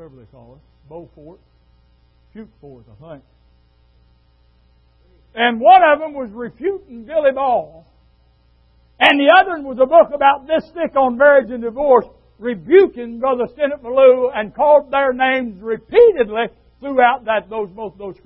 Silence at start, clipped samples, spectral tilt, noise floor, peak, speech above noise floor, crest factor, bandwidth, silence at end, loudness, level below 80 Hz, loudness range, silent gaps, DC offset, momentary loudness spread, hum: 0 s; under 0.1%; -6.5 dB/octave; -55 dBFS; 0 dBFS; 39 dB; 16 dB; 5.4 kHz; 0.15 s; -15 LUFS; -52 dBFS; 4 LU; none; under 0.1%; 15 LU; none